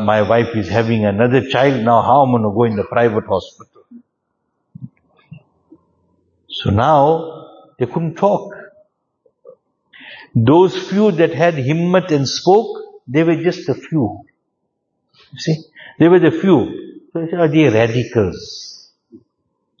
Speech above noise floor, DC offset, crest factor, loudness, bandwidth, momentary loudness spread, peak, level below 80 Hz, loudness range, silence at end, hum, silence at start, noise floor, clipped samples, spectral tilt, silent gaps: 57 dB; under 0.1%; 16 dB; -15 LUFS; 7.4 kHz; 15 LU; 0 dBFS; -52 dBFS; 7 LU; 0.65 s; none; 0 s; -71 dBFS; under 0.1%; -7 dB/octave; none